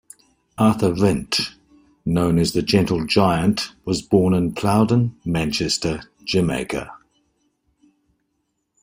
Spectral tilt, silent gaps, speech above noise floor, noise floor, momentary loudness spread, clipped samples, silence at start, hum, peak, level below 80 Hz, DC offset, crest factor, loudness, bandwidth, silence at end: -5.5 dB/octave; none; 54 dB; -73 dBFS; 10 LU; under 0.1%; 0.6 s; none; -2 dBFS; -46 dBFS; under 0.1%; 18 dB; -20 LUFS; 16 kHz; 1.85 s